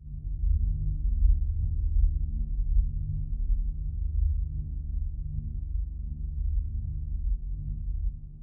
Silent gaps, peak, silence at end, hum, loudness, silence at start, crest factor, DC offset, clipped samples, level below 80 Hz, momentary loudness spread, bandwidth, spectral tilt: none; -12 dBFS; 0 s; 50 Hz at -45 dBFS; -32 LUFS; 0 s; 16 dB; under 0.1%; under 0.1%; -28 dBFS; 8 LU; 0.5 kHz; -20.5 dB/octave